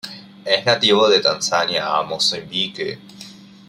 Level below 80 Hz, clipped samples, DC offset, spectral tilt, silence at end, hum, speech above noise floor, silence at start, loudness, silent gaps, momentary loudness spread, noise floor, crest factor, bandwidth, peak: -64 dBFS; under 0.1%; under 0.1%; -2.5 dB/octave; 0.25 s; none; 22 dB; 0.05 s; -17 LUFS; none; 20 LU; -41 dBFS; 18 dB; 15 kHz; -2 dBFS